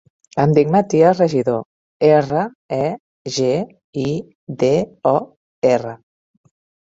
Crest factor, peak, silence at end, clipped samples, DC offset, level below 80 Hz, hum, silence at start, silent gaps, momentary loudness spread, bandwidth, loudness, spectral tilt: 16 dB; -2 dBFS; 0.9 s; under 0.1%; under 0.1%; -56 dBFS; none; 0.35 s; 1.65-2.00 s, 2.55-2.69 s, 3.00-3.25 s, 3.84-3.93 s, 4.35-4.47 s, 5.37-5.62 s; 13 LU; 7.8 kHz; -18 LUFS; -6.5 dB/octave